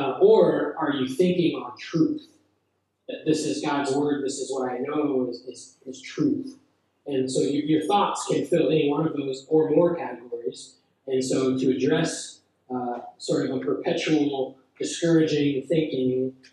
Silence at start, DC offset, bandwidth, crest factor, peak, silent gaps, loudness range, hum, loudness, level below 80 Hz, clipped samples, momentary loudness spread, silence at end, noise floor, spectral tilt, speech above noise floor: 0 s; under 0.1%; 12 kHz; 18 dB; -6 dBFS; none; 4 LU; none; -25 LUFS; -74 dBFS; under 0.1%; 13 LU; 0.2 s; -73 dBFS; -5.5 dB/octave; 49 dB